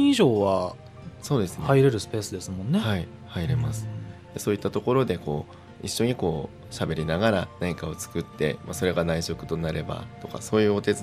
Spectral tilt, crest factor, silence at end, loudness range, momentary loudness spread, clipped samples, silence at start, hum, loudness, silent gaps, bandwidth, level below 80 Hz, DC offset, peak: -6 dB/octave; 20 dB; 0 s; 2 LU; 15 LU; under 0.1%; 0 s; none; -26 LUFS; none; 16 kHz; -48 dBFS; under 0.1%; -6 dBFS